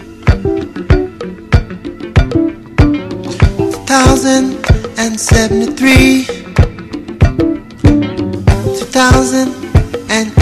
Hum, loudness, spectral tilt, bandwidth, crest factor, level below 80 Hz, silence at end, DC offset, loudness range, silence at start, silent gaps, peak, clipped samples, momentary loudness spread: none; -12 LUFS; -5.5 dB/octave; 14 kHz; 12 dB; -18 dBFS; 0 s; under 0.1%; 4 LU; 0 s; none; 0 dBFS; 1%; 9 LU